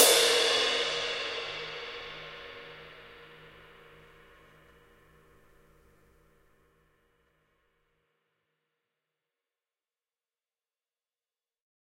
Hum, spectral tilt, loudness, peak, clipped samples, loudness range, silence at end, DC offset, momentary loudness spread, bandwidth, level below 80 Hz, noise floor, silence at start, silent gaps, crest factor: none; 0.5 dB/octave; -27 LUFS; -4 dBFS; under 0.1%; 27 LU; 8.6 s; under 0.1%; 27 LU; 16 kHz; -68 dBFS; under -90 dBFS; 0 s; none; 30 dB